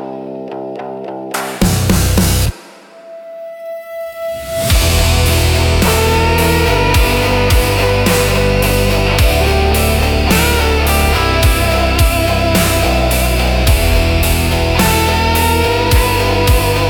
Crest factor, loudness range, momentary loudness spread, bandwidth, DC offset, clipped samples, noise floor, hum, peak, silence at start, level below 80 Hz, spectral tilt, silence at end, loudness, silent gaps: 12 dB; 5 LU; 13 LU; 17.5 kHz; under 0.1%; under 0.1%; -37 dBFS; none; 0 dBFS; 0 s; -18 dBFS; -4.5 dB/octave; 0 s; -12 LUFS; none